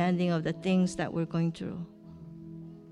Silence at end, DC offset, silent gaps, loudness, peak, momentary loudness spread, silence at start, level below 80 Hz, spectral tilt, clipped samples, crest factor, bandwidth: 0 s; under 0.1%; none; -30 LUFS; -16 dBFS; 19 LU; 0 s; -62 dBFS; -7 dB/octave; under 0.1%; 14 dB; 11 kHz